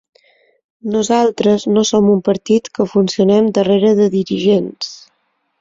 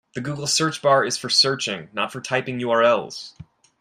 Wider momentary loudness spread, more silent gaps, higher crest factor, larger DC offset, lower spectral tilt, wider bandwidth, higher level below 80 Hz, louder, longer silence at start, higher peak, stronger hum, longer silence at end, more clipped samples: second, 8 LU vs 12 LU; neither; about the same, 14 dB vs 18 dB; neither; first, -5.5 dB/octave vs -3 dB/octave; second, 7.8 kHz vs 15.5 kHz; first, -56 dBFS vs -64 dBFS; first, -14 LUFS vs -20 LUFS; first, 0.85 s vs 0.15 s; about the same, -2 dBFS vs -4 dBFS; neither; first, 0.65 s vs 0.35 s; neither